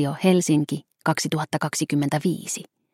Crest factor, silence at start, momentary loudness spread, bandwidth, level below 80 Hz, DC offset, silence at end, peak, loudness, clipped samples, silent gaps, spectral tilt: 18 dB; 0 s; 9 LU; 16 kHz; -68 dBFS; under 0.1%; 0.3 s; -6 dBFS; -24 LUFS; under 0.1%; none; -5 dB/octave